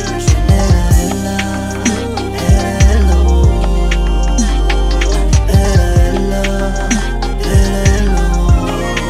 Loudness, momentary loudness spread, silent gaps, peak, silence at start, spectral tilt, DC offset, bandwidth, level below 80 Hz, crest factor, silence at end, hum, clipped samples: -13 LUFS; 6 LU; none; 0 dBFS; 0 s; -5.5 dB/octave; under 0.1%; 14.5 kHz; -12 dBFS; 12 dB; 0 s; none; under 0.1%